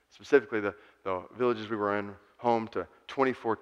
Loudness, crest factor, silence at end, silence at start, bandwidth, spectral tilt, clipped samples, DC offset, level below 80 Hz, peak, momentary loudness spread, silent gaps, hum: -30 LUFS; 22 dB; 0.05 s; 0.2 s; 7.8 kHz; -6.5 dB/octave; under 0.1%; under 0.1%; -72 dBFS; -8 dBFS; 12 LU; none; none